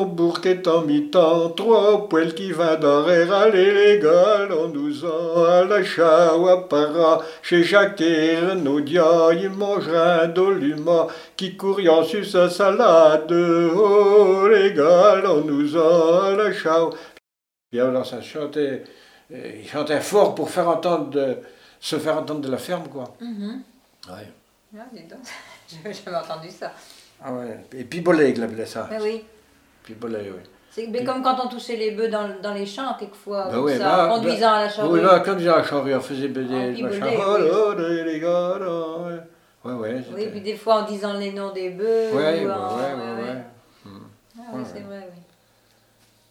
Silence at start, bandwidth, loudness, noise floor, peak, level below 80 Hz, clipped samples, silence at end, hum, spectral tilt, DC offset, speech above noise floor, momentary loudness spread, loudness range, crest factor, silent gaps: 0 s; 15 kHz; -19 LUFS; -86 dBFS; -2 dBFS; -70 dBFS; under 0.1%; 1.2 s; none; -5.5 dB/octave; under 0.1%; 67 dB; 19 LU; 13 LU; 18 dB; none